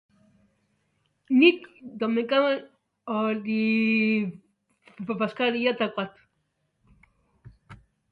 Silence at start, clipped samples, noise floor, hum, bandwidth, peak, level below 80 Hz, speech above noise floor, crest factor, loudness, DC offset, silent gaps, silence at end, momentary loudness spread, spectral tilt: 1.3 s; under 0.1%; -75 dBFS; none; 5 kHz; -6 dBFS; -68 dBFS; 51 dB; 22 dB; -25 LUFS; under 0.1%; none; 0.35 s; 16 LU; -7.5 dB/octave